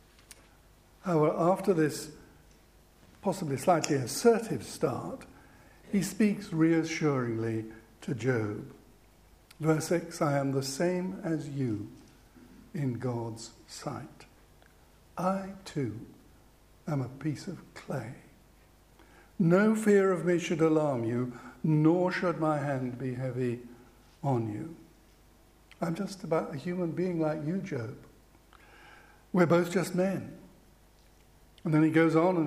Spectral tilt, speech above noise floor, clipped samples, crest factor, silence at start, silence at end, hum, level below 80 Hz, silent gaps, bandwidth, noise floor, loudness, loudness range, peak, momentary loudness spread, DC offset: -6.5 dB/octave; 31 dB; under 0.1%; 22 dB; 0.3 s; 0 s; 50 Hz at -60 dBFS; -62 dBFS; none; 15.5 kHz; -60 dBFS; -30 LUFS; 10 LU; -8 dBFS; 17 LU; under 0.1%